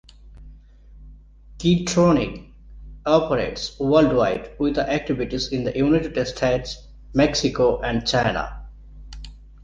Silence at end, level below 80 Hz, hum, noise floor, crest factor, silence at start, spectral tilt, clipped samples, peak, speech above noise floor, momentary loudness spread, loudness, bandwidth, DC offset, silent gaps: 0 s; -40 dBFS; 50 Hz at -45 dBFS; -46 dBFS; 20 dB; 0.25 s; -5.5 dB/octave; under 0.1%; -4 dBFS; 25 dB; 16 LU; -21 LUFS; 9.8 kHz; under 0.1%; none